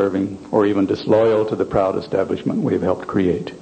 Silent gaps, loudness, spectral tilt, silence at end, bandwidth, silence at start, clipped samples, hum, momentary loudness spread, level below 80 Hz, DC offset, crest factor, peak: none; -19 LUFS; -8 dB/octave; 0 s; 9 kHz; 0 s; under 0.1%; none; 6 LU; -50 dBFS; under 0.1%; 16 dB; -2 dBFS